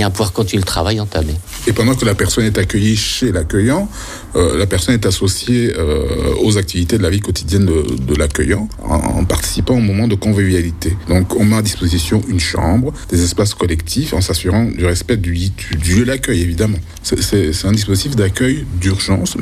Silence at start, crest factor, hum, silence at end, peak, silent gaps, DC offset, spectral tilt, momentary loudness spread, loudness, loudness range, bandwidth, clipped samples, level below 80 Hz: 0 s; 14 dB; none; 0 s; -2 dBFS; none; under 0.1%; -5 dB/octave; 4 LU; -15 LUFS; 1 LU; 15.5 kHz; under 0.1%; -26 dBFS